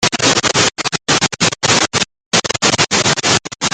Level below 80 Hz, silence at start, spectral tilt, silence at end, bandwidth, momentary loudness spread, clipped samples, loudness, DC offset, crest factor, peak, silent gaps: -48 dBFS; 0 s; -2 dB/octave; 0.05 s; 13 kHz; 4 LU; under 0.1%; -13 LUFS; under 0.1%; 16 dB; 0 dBFS; 2.26-2.31 s